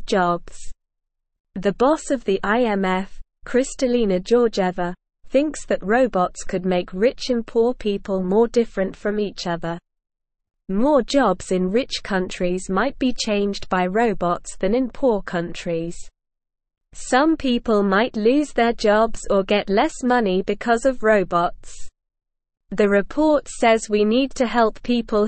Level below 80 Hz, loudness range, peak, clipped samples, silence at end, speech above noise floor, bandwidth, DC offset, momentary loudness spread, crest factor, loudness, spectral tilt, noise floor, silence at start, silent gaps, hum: -42 dBFS; 4 LU; -4 dBFS; under 0.1%; 0 s; 58 dB; 8.8 kHz; 0.4%; 8 LU; 16 dB; -21 LUFS; -5 dB/octave; -78 dBFS; 0 s; 1.40-1.44 s; none